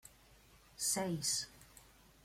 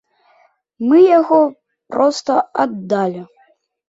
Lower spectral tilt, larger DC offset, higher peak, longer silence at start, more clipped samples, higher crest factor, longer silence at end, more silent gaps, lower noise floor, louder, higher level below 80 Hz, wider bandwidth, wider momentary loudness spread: second, -2.5 dB/octave vs -6 dB/octave; neither; second, -24 dBFS vs -2 dBFS; second, 0.05 s vs 0.8 s; neither; about the same, 18 dB vs 14 dB; second, 0.4 s vs 0.65 s; neither; first, -64 dBFS vs -57 dBFS; second, -37 LUFS vs -15 LUFS; about the same, -68 dBFS vs -66 dBFS; first, 16.5 kHz vs 8 kHz; first, 24 LU vs 13 LU